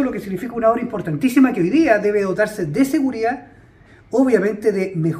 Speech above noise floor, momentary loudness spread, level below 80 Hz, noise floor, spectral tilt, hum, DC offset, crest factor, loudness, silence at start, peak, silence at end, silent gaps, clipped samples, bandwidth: 30 dB; 8 LU; -52 dBFS; -47 dBFS; -7 dB/octave; none; under 0.1%; 18 dB; -18 LUFS; 0 s; 0 dBFS; 0 s; none; under 0.1%; 15.5 kHz